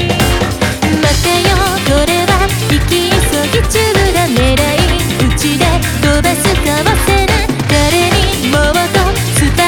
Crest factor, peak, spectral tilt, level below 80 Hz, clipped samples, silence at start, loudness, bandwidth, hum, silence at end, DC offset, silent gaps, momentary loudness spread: 10 dB; 0 dBFS; -4 dB/octave; -18 dBFS; under 0.1%; 0 s; -11 LUFS; over 20 kHz; none; 0 s; under 0.1%; none; 2 LU